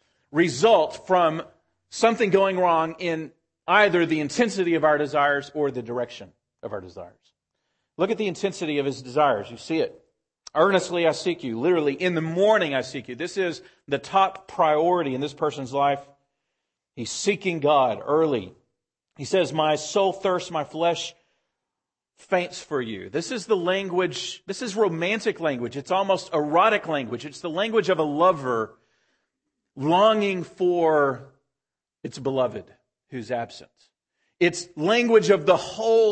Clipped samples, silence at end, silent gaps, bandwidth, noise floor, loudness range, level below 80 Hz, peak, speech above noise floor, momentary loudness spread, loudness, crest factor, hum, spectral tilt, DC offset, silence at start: under 0.1%; 0 s; none; 8.8 kHz; -89 dBFS; 6 LU; -68 dBFS; -4 dBFS; 66 dB; 12 LU; -23 LUFS; 20 dB; none; -4.5 dB/octave; under 0.1%; 0.35 s